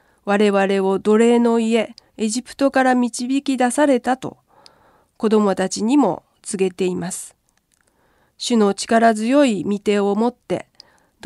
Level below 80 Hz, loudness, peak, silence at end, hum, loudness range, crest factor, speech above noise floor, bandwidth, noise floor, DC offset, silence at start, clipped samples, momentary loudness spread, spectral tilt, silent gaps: -62 dBFS; -18 LUFS; -4 dBFS; 0.65 s; none; 4 LU; 16 dB; 46 dB; 12.5 kHz; -63 dBFS; under 0.1%; 0.25 s; under 0.1%; 12 LU; -5 dB/octave; none